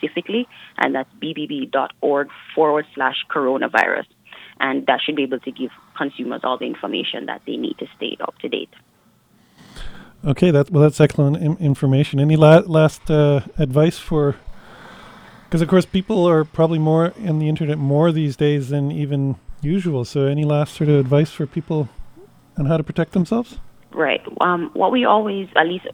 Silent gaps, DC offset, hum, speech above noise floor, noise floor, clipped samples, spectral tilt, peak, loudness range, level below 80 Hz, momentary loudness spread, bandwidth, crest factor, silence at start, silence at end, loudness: none; under 0.1%; none; 38 dB; -56 dBFS; under 0.1%; -7.5 dB/octave; 0 dBFS; 9 LU; -44 dBFS; 12 LU; 11.5 kHz; 18 dB; 0 s; 0 s; -19 LUFS